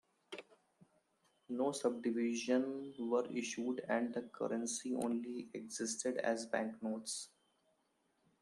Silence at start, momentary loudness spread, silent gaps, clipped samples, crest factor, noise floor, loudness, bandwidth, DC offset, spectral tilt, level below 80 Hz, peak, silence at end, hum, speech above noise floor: 0.3 s; 10 LU; none; under 0.1%; 18 dB; -79 dBFS; -39 LUFS; 13 kHz; under 0.1%; -3.5 dB/octave; -88 dBFS; -22 dBFS; 1.15 s; none; 41 dB